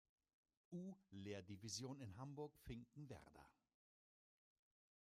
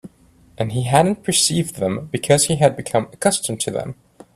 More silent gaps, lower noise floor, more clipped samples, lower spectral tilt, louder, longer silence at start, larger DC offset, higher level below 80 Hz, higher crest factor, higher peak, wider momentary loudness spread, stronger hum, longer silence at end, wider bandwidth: neither; first, under -90 dBFS vs -52 dBFS; neither; about the same, -5 dB/octave vs -4 dB/octave; second, -56 LUFS vs -19 LUFS; first, 0.7 s vs 0.05 s; neither; second, -76 dBFS vs -52 dBFS; about the same, 20 dB vs 20 dB; second, -38 dBFS vs 0 dBFS; about the same, 9 LU vs 9 LU; neither; first, 1.5 s vs 0.4 s; about the same, 15 kHz vs 15 kHz